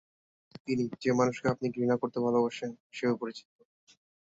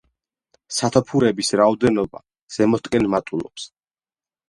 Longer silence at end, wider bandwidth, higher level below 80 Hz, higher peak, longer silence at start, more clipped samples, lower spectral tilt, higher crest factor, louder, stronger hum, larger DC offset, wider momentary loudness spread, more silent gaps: about the same, 0.95 s vs 0.85 s; second, 7.8 kHz vs 11.5 kHz; second, -70 dBFS vs -52 dBFS; second, -14 dBFS vs 0 dBFS; about the same, 0.65 s vs 0.7 s; neither; first, -6.5 dB/octave vs -5 dB/octave; about the same, 18 dB vs 20 dB; second, -31 LUFS vs -20 LUFS; neither; neither; second, 12 LU vs 15 LU; about the same, 2.80-2.90 s vs 2.42-2.47 s